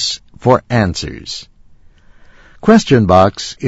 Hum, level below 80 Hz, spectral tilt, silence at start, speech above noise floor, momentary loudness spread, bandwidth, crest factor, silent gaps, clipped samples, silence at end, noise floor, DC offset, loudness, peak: none; -38 dBFS; -5.5 dB/octave; 0 s; 31 dB; 16 LU; 8 kHz; 14 dB; none; 0.3%; 0 s; -43 dBFS; under 0.1%; -13 LUFS; 0 dBFS